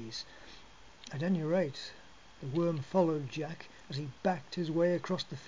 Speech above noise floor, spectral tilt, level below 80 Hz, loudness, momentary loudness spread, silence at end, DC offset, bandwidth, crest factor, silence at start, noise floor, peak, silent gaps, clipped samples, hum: 23 dB; -6.5 dB/octave; -66 dBFS; -34 LUFS; 18 LU; 0 s; 0.2%; 7.6 kHz; 20 dB; 0 s; -56 dBFS; -16 dBFS; none; under 0.1%; none